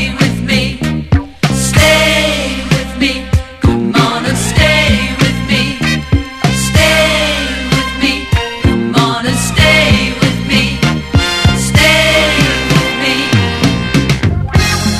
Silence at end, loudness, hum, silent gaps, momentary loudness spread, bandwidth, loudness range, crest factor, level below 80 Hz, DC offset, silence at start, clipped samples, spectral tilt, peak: 0 s; -11 LUFS; none; none; 7 LU; 14.5 kHz; 2 LU; 12 dB; -22 dBFS; under 0.1%; 0 s; 0.2%; -4.5 dB/octave; 0 dBFS